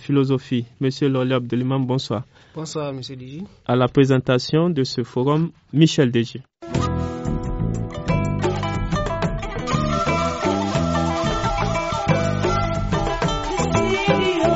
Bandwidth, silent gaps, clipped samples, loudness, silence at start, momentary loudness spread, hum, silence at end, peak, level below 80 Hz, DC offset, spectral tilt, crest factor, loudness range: 8 kHz; none; under 0.1%; -21 LUFS; 0 s; 10 LU; none; 0 s; -2 dBFS; -34 dBFS; under 0.1%; -5.5 dB/octave; 18 dB; 4 LU